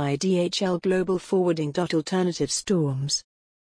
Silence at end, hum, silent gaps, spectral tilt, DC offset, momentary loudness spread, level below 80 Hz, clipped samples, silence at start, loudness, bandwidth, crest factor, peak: 0.4 s; none; none; -5 dB/octave; under 0.1%; 3 LU; -58 dBFS; under 0.1%; 0 s; -25 LUFS; 10.5 kHz; 12 dB; -12 dBFS